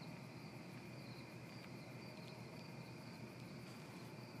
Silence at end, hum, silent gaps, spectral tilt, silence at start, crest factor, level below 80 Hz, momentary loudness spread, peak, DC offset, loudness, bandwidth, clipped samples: 0 s; none; none; -5.5 dB/octave; 0 s; 12 dB; -80 dBFS; 1 LU; -42 dBFS; under 0.1%; -54 LUFS; 15.5 kHz; under 0.1%